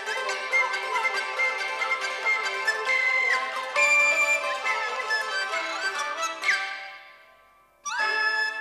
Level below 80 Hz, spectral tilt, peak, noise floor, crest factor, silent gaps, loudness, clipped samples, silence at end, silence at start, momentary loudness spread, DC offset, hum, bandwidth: -76 dBFS; 1.5 dB/octave; -12 dBFS; -58 dBFS; 16 dB; none; -24 LUFS; under 0.1%; 0 s; 0 s; 9 LU; under 0.1%; none; 15.5 kHz